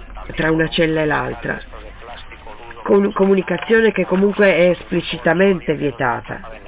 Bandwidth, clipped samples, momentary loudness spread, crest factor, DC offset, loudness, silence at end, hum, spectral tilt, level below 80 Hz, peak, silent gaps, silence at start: 4 kHz; under 0.1%; 22 LU; 14 dB; under 0.1%; -17 LUFS; 0 s; none; -10.5 dB/octave; -40 dBFS; -4 dBFS; none; 0 s